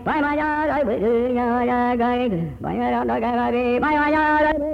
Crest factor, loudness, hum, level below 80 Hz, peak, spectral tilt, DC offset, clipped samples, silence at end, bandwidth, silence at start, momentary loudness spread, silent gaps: 10 dB; -20 LUFS; none; -42 dBFS; -10 dBFS; -8 dB/octave; under 0.1%; under 0.1%; 0 s; 6.2 kHz; 0 s; 5 LU; none